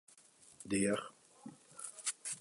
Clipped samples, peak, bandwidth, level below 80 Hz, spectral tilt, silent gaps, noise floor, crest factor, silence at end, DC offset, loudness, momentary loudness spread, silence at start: under 0.1%; -20 dBFS; 11.5 kHz; -72 dBFS; -3.5 dB/octave; none; -64 dBFS; 20 dB; 0 s; under 0.1%; -38 LUFS; 21 LU; 0.15 s